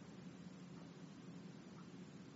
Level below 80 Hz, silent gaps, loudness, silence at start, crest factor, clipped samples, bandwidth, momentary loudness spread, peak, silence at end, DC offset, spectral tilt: -84 dBFS; none; -56 LUFS; 0 s; 12 dB; under 0.1%; 7.6 kHz; 1 LU; -44 dBFS; 0 s; under 0.1%; -6 dB/octave